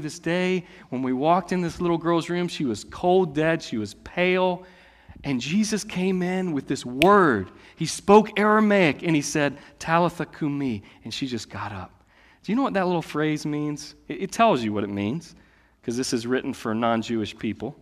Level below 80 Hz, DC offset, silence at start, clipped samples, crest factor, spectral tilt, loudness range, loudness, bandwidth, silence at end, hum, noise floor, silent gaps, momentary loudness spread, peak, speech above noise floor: -56 dBFS; under 0.1%; 0 s; under 0.1%; 22 dB; -5.5 dB/octave; 7 LU; -24 LUFS; 15 kHz; 0.1 s; none; -56 dBFS; none; 15 LU; -2 dBFS; 32 dB